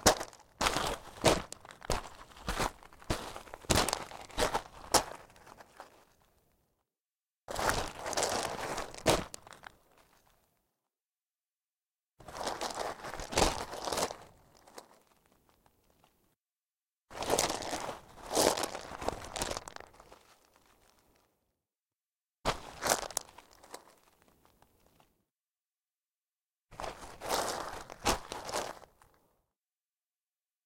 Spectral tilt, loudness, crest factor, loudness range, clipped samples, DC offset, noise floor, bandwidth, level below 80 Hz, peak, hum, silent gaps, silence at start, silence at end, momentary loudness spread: -2.5 dB/octave; -34 LUFS; 32 dB; 10 LU; under 0.1%; under 0.1%; under -90 dBFS; 16.5 kHz; -52 dBFS; -6 dBFS; none; 11.31-11.35 s, 16.73-16.86 s, 16.93-16.97 s, 25.98-26.02 s, 26.17-26.21 s, 26.45-26.49 s; 0 s; 1.8 s; 23 LU